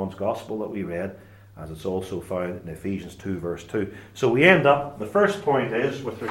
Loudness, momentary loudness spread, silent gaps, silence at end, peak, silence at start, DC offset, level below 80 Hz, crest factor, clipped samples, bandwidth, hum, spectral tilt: -24 LUFS; 15 LU; none; 0 s; 0 dBFS; 0 s; under 0.1%; -56 dBFS; 24 dB; under 0.1%; 16.5 kHz; none; -6 dB/octave